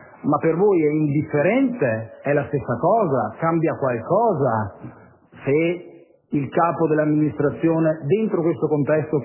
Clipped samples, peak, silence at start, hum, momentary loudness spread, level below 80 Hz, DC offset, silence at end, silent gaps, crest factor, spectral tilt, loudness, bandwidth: under 0.1%; -6 dBFS; 0 s; none; 6 LU; -56 dBFS; under 0.1%; 0 s; none; 14 dB; -12 dB/octave; -21 LUFS; 3.1 kHz